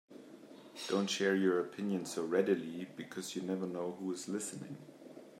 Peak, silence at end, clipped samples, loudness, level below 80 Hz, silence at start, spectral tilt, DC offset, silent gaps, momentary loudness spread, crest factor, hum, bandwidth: -18 dBFS; 0 s; under 0.1%; -36 LUFS; -88 dBFS; 0.1 s; -4.5 dB/octave; under 0.1%; none; 22 LU; 20 dB; none; 15.5 kHz